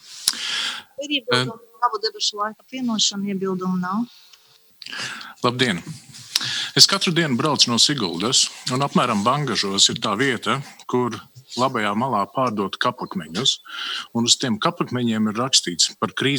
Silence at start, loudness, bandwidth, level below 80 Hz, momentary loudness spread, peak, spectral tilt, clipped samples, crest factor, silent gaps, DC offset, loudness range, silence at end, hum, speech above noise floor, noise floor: 0.05 s; -20 LUFS; over 20 kHz; -70 dBFS; 12 LU; 0 dBFS; -3 dB/octave; under 0.1%; 22 dB; none; under 0.1%; 7 LU; 0 s; none; 31 dB; -53 dBFS